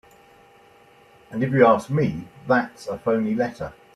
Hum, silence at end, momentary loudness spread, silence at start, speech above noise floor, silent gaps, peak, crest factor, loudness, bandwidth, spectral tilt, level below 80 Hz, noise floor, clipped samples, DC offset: none; 0.25 s; 16 LU; 1.3 s; 31 dB; none; -4 dBFS; 20 dB; -22 LUFS; 13 kHz; -7.5 dB/octave; -56 dBFS; -53 dBFS; under 0.1%; under 0.1%